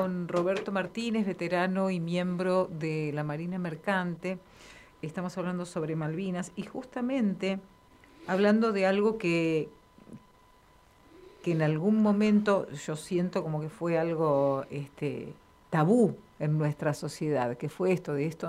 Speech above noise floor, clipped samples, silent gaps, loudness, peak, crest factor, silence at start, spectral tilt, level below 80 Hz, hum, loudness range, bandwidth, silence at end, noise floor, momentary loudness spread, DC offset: 31 dB; under 0.1%; none; -30 LUFS; -12 dBFS; 18 dB; 0 s; -7 dB/octave; -66 dBFS; none; 6 LU; 13 kHz; 0 s; -60 dBFS; 12 LU; under 0.1%